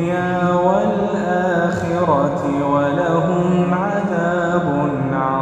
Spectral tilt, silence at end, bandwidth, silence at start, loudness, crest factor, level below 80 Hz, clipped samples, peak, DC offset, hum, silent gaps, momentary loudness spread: -7.5 dB/octave; 0 s; 8.6 kHz; 0 s; -18 LUFS; 14 dB; -46 dBFS; under 0.1%; -2 dBFS; under 0.1%; none; none; 3 LU